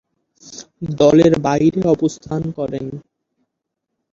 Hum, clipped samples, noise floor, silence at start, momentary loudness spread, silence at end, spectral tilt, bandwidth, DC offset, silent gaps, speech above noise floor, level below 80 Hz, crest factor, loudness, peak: none; under 0.1%; -78 dBFS; 0.45 s; 24 LU; 1.15 s; -7 dB/octave; 7.6 kHz; under 0.1%; none; 62 dB; -48 dBFS; 18 dB; -16 LUFS; -2 dBFS